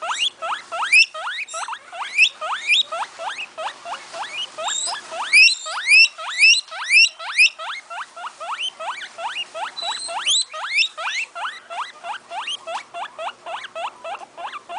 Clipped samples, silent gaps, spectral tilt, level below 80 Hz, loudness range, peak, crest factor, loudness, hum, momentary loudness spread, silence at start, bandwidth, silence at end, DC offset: under 0.1%; none; 3.5 dB/octave; -80 dBFS; 11 LU; -2 dBFS; 20 dB; -17 LUFS; none; 19 LU; 0 s; 10.5 kHz; 0 s; under 0.1%